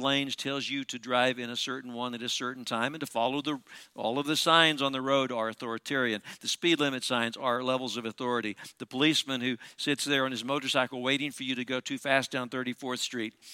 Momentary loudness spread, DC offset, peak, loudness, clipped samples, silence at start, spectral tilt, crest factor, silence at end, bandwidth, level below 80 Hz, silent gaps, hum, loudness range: 9 LU; under 0.1%; -6 dBFS; -29 LUFS; under 0.1%; 0 s; -3 dB/octave; 24 dB; 0 s; 16.5 kHz; -78 dBFS; none; none; 4 LU